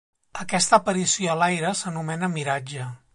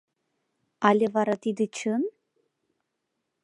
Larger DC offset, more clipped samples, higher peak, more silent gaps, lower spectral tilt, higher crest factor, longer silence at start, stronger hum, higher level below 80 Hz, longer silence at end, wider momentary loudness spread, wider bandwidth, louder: neither; neither; about the same, -4 dBFS vs -4 dBFS; neither; second, -3.5 dB/octave vs -5.5 dB/octave; about the same, 20 dB vs 24 dB; second, 0.35 s vs 0.8 s; neither; first, -64 dBFS vs -80 dBFS; second, 0.2 s vs 1.35 s; first, 15 LU vs 7 LU; about the same, 11.5 kHz vs 11 kHz; first, -23 LUFS vs -26 LUFS